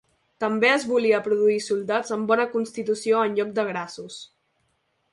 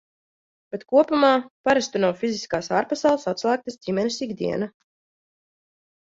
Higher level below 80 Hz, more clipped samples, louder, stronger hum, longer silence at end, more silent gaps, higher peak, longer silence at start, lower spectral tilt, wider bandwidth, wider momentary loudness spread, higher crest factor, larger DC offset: second, -72 dBFS vs -64 dBFS; neither; about the same, -23 LUFS vs -23 LUFS; neither; second, 0.9 s vs 1.35 s; second, none vs 1.50-1.64 s; about the same, -6 dBFS vs -4 dBFS; second, 0.4 s vs 0.75 s; about the same, -4 dB/octave vs -4.5 dB/octave; first, 11.5 kHz vs 7.8 kHz; first, 12 LU vs 9 LU; about the same, 18 dB vs 20 dB; neither